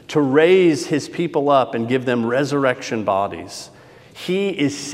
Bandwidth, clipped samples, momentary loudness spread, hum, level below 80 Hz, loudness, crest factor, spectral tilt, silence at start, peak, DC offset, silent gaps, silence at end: 14 kHz; under 0.1%; 16 LU; none; -66 dBFS; -18 LUFS; 18 dB; -5.5 dB/octave; 0.1 s; -2 dBFS; under 0.1%; none; 0 s